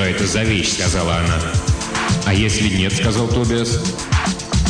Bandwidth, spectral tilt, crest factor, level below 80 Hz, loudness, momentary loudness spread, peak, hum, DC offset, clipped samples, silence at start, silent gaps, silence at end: 10 kHz; -4.5 dB/octave; 12 dB; -28 dBFS; -17 LUFS; 3 LU; -6 dBFS; none; under 0.1%; under 0.1%; 0 s; none; 0 s